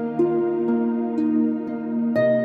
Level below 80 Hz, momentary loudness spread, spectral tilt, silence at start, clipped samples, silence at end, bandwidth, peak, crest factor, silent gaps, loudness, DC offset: -66 dBFS; 4 LU; -9.5 dB/octave; 0 s; under 0.1%; 0 s; 4.6 kHz; -10 dBFS; 12 dB; none; -22 LUFS; under 0.1%